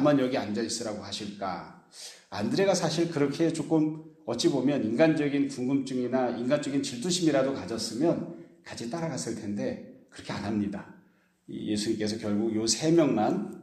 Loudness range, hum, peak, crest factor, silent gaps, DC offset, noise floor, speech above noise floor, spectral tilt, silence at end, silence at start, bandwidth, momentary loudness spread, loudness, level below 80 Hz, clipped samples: 7 LU; none; -10 dBFS; 18 dB; none; under 0.1%; -63 dBFS; 35 dB; -5 dB/octave; 0 s; 0 s; 13 kHz; 16 LU; -28 LUFS; -68 dBFS; under 0.1%